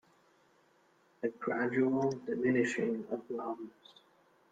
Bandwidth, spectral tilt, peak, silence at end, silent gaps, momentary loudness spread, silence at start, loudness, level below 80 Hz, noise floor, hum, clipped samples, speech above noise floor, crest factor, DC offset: 9.2 kHz; -6.5 dB/octave; -18 dBFS; 0.85 s; none; 10 LU; 1.2 s; -34 LUFS; -78 dBFS; -69 dBFS; none; under 0.1%; 35 dB; 18 dB; under 0.1%